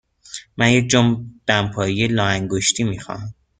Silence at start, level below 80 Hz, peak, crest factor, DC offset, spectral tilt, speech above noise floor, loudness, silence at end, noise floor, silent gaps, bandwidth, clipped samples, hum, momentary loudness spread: 0.3 s; -48 dBFS; -2 dBFS; 18 dB; under 0.1%; -4 dB/octave; 21 dB; -18 LUFS; 0.25 s; -39 dBFS; none; 9.6 kHz; under 0.1%; none; 16 LU